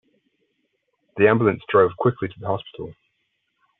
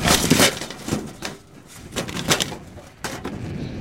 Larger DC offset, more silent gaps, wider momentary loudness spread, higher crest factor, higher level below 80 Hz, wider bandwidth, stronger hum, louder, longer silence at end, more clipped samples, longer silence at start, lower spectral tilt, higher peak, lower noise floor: neither; neither; second, 20 LU vs 24 LU; about the same, 20 dB vs 22 dB; second, -62 dBFS vs -42 dBFS; second, 4 kHz vs 17 kHz; neither; about the same, -20 LUFS vs -22 LUFS; first, 0.85 s vs 0 s; neither; first, 1.15 s vs 0 s; first, -6 dB/octave vs -3 dB/octave; about the same, -4 dBFS vs -2 dBFS; first, -73 dBFS vs -43 dBFS